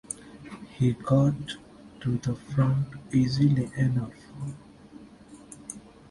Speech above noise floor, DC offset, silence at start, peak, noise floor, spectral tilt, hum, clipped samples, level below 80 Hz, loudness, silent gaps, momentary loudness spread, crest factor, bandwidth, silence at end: 24 dB; under 0.1%; 0.1 s; -10 dBFS; -49 dBFS; -7 dB/octave; none; under 0.1%; -54 dBFS; -27 LUFS; none; 20 LU; 18 dB; 11.5 kHz; 0.3 s